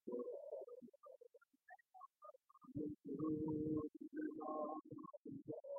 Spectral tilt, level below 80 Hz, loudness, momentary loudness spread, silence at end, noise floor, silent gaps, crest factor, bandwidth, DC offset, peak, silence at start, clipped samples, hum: -3 dB/octave; -78 dBFS; -48 LUFS; 21 LU; 0 s; -69 dBFS; 5.17-5.25 s; 16 dB; 1.8 kHz; under 0.1%; -32 dBFS; 0.05 s; under 0.1%; none